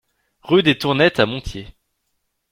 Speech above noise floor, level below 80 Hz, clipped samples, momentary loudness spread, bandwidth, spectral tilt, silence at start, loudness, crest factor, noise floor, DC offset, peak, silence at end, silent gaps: 55 dB; -44 dBFS; under 0.1%; 17 LU; 16 kHz; -6 dB/octave; 0.45 s; -17 LUFS; 18 dB; -72 dBFS; under 0.1%; -2 dBFS; 0.85 s; none